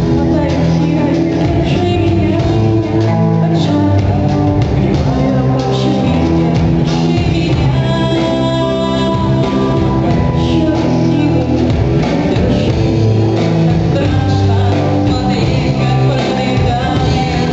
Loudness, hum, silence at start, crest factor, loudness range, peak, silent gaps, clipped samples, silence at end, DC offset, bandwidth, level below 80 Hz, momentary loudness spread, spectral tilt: -13 LUFS; none; 0 s; 10 dB; 1 LU; -2 dBFS; none; under 0.1%; 0 s; under 0.1%; 8 kHz; -26 dBFS; 1 LU; -7.5 dB/octave